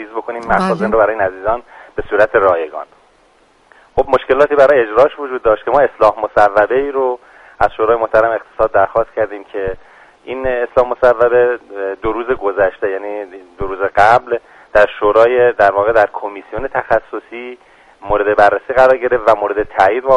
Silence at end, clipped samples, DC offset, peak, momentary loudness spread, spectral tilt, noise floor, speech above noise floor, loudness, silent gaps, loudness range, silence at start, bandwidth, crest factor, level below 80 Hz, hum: 0 s; under 0.1%; under 0.1%; 0 dBFS; 14 LU; -6 dB/octave; -51 dBFS; 38 dB; -14 LUFS; none; 4 LU; 0 s; 10.5 kHz; 14 dB; -40 dBFS; none